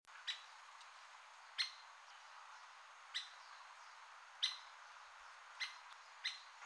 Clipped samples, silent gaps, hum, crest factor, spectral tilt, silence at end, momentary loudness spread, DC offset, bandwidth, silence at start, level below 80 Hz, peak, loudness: under 0.1%; none; none; 28 dB; 5.5 dB/octave; 0 s; 16 LU; under 0.1%; 11 kHz; 0.05 s; under -90 dBFS; -24 dBFS; -49 LUFS